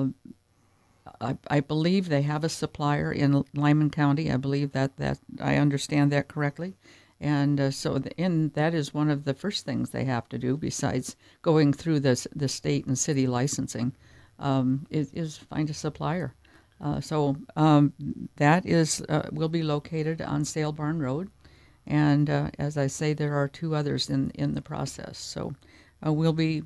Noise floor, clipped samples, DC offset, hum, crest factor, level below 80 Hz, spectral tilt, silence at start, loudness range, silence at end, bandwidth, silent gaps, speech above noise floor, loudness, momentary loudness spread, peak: -64 dBFS; under 0.1%; under 0.1%; none; 20 dB; -56 dBFS; -6 dB/octave; 0 s; 4 LU; 0 s; 11 kHz; none; 38 dB; -27 LUFS; 11 LU; -6 dBFS